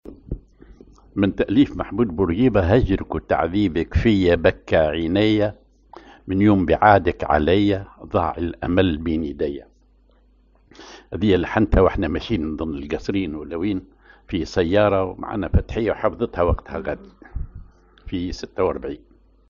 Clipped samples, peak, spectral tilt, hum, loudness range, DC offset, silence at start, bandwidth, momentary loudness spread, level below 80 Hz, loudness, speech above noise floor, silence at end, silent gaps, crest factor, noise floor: under 0.1%; 0 dBFS; -6 dB/octave; none; 6 LU; under 0.1%; 0.05 s; 7.2 kHz; 14 LU; -34 dBFS; -21 LUFS; 36 dB; 0.55 s; none; 20 dB; -56 dBFS